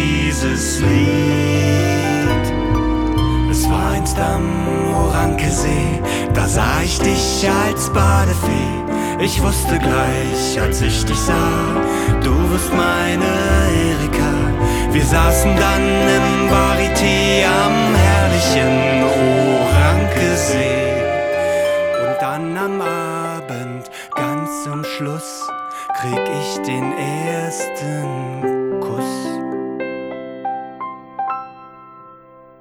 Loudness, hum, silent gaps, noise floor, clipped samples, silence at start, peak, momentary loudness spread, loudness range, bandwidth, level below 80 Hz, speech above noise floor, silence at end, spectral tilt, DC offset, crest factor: -17 LUFS; none; none; -43 dBFS; under 0.1%; 0 s; -2 dBFS; 11 LU; 9 LU; 18.5 kHz; -26 dBFS; 27 dB; 0.45 s; -5 dB/octave; under 0.1%; 14 dB